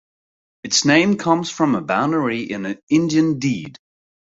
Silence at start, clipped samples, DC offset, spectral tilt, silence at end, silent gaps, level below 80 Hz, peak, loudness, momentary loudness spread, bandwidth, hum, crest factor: 0.65 s; under 0.1%; under 0.1%; -4.5 dB/octave; 0.5 s; 2.83-2.87 s; -60 dBFS; -2 dBFS; -18 LUFS; 12 LU; 8 kHz; none; 18 dB